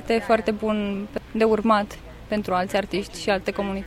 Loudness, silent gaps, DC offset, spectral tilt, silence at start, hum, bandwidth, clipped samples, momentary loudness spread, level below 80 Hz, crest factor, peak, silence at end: -24 LUFS; none; under 0.1%; -5.5 dB/octave; 0 s; none; 15.5 kHz; under 0.1%; 9 LU; -46 dBFS; 16 dB; -6 dBFS; 0 s